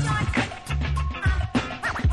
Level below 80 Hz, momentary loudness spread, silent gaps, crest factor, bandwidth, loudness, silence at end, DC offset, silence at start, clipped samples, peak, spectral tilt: -30 dBFS; 4 LU; none; 14 dB; 12 kHz; -26 LUFS; 0 s; under 0.1%; 0 s; under 0.1%; -10 dBFS; -5.5 dB/octave